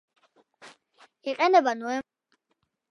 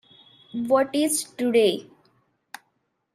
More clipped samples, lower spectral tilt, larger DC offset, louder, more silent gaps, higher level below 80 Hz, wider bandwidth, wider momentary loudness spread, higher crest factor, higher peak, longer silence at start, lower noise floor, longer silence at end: neither; about the same, -3 dB/octave vs -3 dB/octave; neither; about the same, -25 LUFS vs -23 LUFS; neither; about the same, -78 dBFS vs -74 dBFS; second, 11 kHz vs 15 kHz; second, 14 LU vs 24 LU; about the same, 22 dB vs 18 dB; about the same, -8 dBFS vs -8 dBFS; about the same, 0.65 s vs 0.55 s; first, -77 dBFS vs -73 dBFS; second, 0.9 s vs 1.3 s